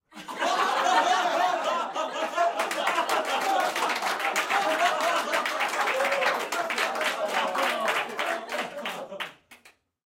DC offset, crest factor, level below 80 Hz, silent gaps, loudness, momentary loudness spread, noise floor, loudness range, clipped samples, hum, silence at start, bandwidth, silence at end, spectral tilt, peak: under 0.1%; 18 dB; -78 dBFS; none; -26 LUFS; 8 LU; -59 dBFS; 3 LU; under 0.1%; none; 0.15 s; 17 kHz; 0.35 s; -1 dB/octave; -8 dBFS